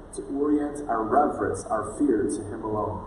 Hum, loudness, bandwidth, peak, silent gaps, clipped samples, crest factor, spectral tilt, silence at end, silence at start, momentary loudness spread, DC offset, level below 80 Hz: none; -26 LUFS; 11.5 kHz; -8 dBFS; none; under 0.1%; 18 dB; -6.5 dB/octave; 0 s; 0 s; 7 LU; under 0.1%; -48 dBFS